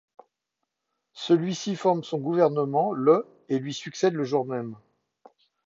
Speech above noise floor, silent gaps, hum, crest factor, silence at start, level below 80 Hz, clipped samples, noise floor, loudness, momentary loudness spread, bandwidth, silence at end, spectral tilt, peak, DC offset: 58 dB; none; none; 20 dB; 1.15 s; -78 dBFS; under 0.1%; -83 dBFS; -25 LUFS; 11 LU; 7.8 kHz; 0.9 s; -6 dB/octave; -8 dBFS; under 0.1%